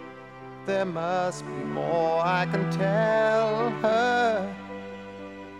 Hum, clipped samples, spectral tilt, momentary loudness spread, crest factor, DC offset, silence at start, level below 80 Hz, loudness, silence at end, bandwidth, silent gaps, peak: none; under 0.1%; -6 dB/octave; 17 LU; 14 dB; under 0.1%; 0 s; -66 dBFS; -25 LUFS; 0 s; 11.5 kHz; none; -12 dBFS